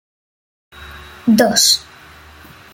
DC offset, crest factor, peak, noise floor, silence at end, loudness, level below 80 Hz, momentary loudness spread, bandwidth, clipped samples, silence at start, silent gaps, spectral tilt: under 0.1%; 20 dB; 0 dBFS; -41 dBFS; 0.9 s; -13 LUFS; -48 dBFS; 25 LU; 17 kHz; under 0.1%; 0.8 s; none; -2.5 dB/octave